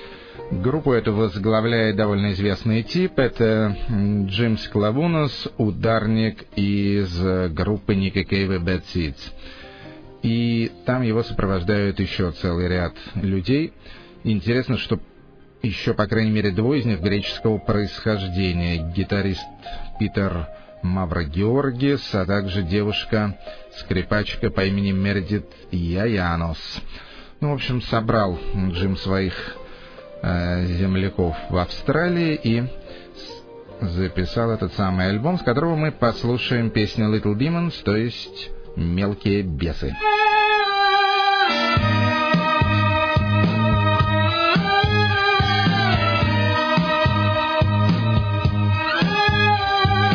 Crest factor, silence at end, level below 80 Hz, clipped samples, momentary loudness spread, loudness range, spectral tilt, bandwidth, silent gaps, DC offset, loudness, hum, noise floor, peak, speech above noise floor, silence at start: 16 dB; 0 s; -38 dBFS; under 0.1%; 12 LU; 6 LU; -7.5 dB/octave; 5.4 kHz; none; under 0.1%; -21 LUFS; none; -47 dBFS; -4 dBFS; 26 dB; 0 s